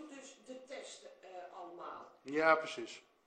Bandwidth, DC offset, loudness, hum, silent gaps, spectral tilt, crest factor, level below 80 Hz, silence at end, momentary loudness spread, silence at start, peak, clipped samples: 9.4 kHz; under 0.1%; -36 LUFS; none; none; -3 dB/octave; 22 dB; -84 dBFS; 0.25 s; 22 LU; 0 s; -16 dBFS; under 0.1%